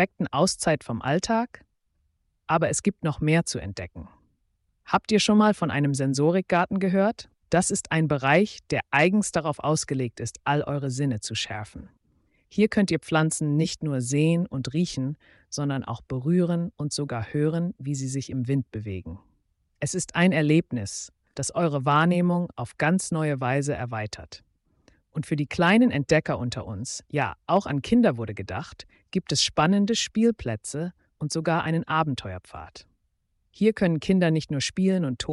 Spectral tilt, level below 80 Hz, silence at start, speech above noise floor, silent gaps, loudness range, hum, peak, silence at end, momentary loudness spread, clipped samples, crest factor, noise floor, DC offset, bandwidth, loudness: -5 dB/octave; -54 dBFS; 0 s; 48 dB; none; 4 LU; none; -8 dBFS; 0 s; 13 LU; under 0.1%; 16 dB; -73 dBFS; under 0.1%; 11.5 kHz; -25 LUFS